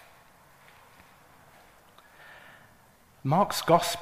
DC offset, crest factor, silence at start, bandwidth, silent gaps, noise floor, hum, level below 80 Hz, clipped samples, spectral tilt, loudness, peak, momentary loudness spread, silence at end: under 0.1%; 24 dB; 3.25 s; 15.5 kHz; none; -59 dBFS; none; -64 dBFS; under 0.1%; -4.5 dB/octave; -26 LUFS; -8 dBFS; 27 LU; 0 s